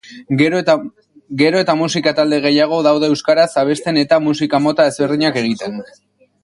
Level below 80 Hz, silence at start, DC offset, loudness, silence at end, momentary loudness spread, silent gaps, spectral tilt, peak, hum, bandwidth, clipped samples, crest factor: -60 dBFS; 0.1 s; under 0.1%; -15 LUFS; 0.6 s; 7 LU; none; -5 dB/octave; 0 dBFS; none; 11.5 kHz; under 0.1%; 14 dB